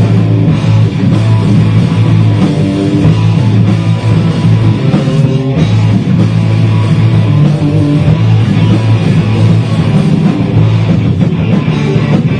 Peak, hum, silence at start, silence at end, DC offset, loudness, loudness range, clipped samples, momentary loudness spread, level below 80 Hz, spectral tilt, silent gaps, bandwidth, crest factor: 0 dBFS; none; 0 s; 0 s; 0.1%; -9 LUFS; 1 LU; 0.2%; 2 LU; -32 dBFS; -8.5 dB/octave; none; 9.6 kHz; 8 dB